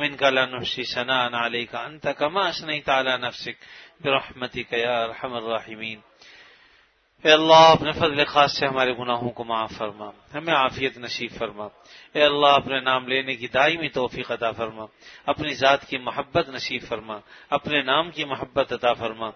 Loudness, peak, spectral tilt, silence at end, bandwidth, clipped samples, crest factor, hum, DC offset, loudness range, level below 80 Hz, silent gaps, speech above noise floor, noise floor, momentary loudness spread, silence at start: -22 LUFS; -2 dBFS; -4 dB/octave; 0.05 s; 6.6 kHz; under 0.1%; 22 dB; none; under 0.1%; 8 LU; -58 dBFS; none; 37 dB; -60 dBFS; 14 LU; 0 s